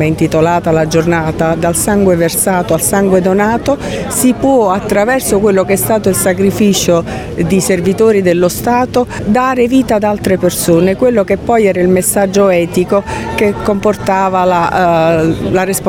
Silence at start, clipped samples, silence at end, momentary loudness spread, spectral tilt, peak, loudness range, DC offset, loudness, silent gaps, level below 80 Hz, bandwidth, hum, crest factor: 0 s; under 0.1%; 0 s; 4 LU; -5 dB/octave; 0 dBFS; 1 LU; under 0.1%; -11 LUFS; none; -34 dBFS; 17 kHz; none; 10 dB